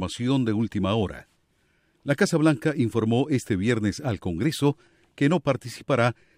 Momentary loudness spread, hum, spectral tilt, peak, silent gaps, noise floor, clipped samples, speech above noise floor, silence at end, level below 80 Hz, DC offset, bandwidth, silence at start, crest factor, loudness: 7 LU; none; -6.5 dB/octave; -6 dBFS; none; -67 dBFS; under 0.1%; 43 dB; 0.25 s; -54 dBFS; under 0.1%; 15.5 kHz; 0 s; 18 dB; -25 LUFS